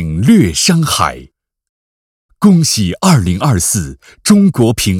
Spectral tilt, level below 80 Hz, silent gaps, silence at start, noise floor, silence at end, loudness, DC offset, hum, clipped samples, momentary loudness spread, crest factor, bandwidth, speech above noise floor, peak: -5 dB/octave; -34 dBFS; 1.69-2.29 s; 0 s; under -90 dBFS; 0 s; -11 LUFS; under 0.1%; none; 0.4%; 7 LU; 12 dB; 16.5 kHz; over 79 dB; 0 dBFS